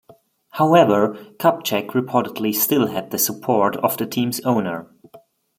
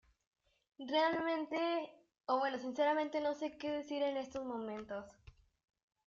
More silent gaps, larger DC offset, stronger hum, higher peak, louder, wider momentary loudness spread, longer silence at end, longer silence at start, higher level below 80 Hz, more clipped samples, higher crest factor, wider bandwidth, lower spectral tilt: neither; neither; neither; first, -2 dBFS vs -22 dBFS; first, -19 LUFS vs -38 LUFS; second, 8 LU vs 13 LU; second, 0.4 s vs 0.75 s; second, 0.55 s vs 0.8 s; first, -66 dBFS vs -74 dBFS; neither; about the same, 18 dB vs 18 dB; first, 16.5 kHz vs 7.4 kHz; first, -4.5 dB/octave vs -1.5 dB/octave